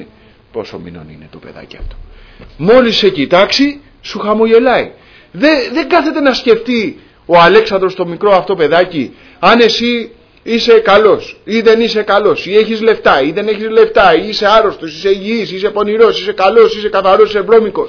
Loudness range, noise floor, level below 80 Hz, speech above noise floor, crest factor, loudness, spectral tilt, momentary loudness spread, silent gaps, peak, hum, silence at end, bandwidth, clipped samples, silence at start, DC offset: 2 LU; -42 dBFS; -40 dBFS; 32 dB; 10 dB; -10 LUFS; -5 dB/octave; 13 LU; none; 0 dBFS; none; 0 s; 5.4 kHz; 0.4%; 0 s; under 0.1%